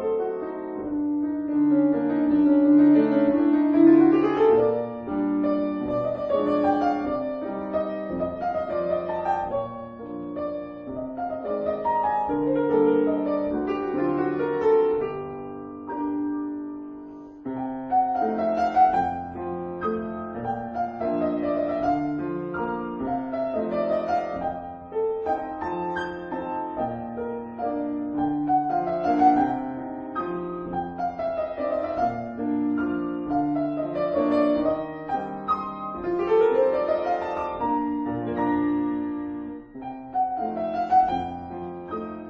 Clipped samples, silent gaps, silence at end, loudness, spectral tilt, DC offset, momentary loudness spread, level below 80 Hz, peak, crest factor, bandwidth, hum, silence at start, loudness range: under 0.1%; none; 0 s; -25 LUFS; -9 dB/octave; under 0.1%; 12 LU; -54 dBFS; -6 dBFS; 18 dB; 5.4 kHz; none; 0 s; 8 LU